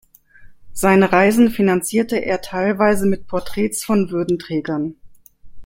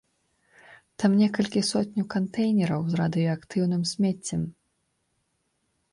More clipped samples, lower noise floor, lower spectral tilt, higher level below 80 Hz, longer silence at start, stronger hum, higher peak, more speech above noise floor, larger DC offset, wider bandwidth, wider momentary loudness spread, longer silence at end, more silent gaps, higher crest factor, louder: neither; second, -43 dBFS vs -74 dBFS; about the same, -5.5 dB/octave vs -6 dB/octave; first, -46 dBFS vs -62 dBFS; second, 0.4 s vs 0.7 s; neither; first, 0 dBFS vs -10 dBFS; second, 26 dB vs 50 dB; neither; first, 16.5 kHz vs 11.5 kHz; first, 11 LU vs 7 LU; second, 0 s vs 1.4 s; neither; about the same, 18 dB vs 16 dB; first, -18 LUFS vs -26 LUFS